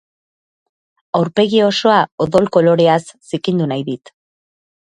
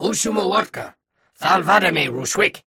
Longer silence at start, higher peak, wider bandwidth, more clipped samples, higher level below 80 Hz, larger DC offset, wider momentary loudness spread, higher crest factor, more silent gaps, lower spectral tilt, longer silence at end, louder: first, 1.15 s vs 0 s; first, 0 dBFS vs -4 dBFS; second, 11 kHz vs 18 kHz; neither; about the same, -56 dBFS vs -56 dBFS; neither; second, 10 LU vs 14 LU; about the same, 16 dB vs 16 dB; first, 2.12-2.18 s vs none; first, -6 dB/octave vs -3 dB/octave; first, 0.9 s vs 0.1 s; first, -15 LUFS vs -18 LUFS